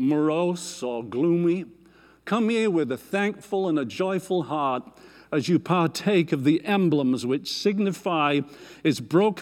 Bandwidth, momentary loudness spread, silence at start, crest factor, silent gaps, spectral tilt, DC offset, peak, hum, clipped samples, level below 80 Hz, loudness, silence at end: 15.5 kHz; 8 LU; 0 s; 14 dB; none; -6 dB/octave; under 0.1%; -10 dBFS; none; under 0.1%; -68 dBFS; -24 LUFS; 0 s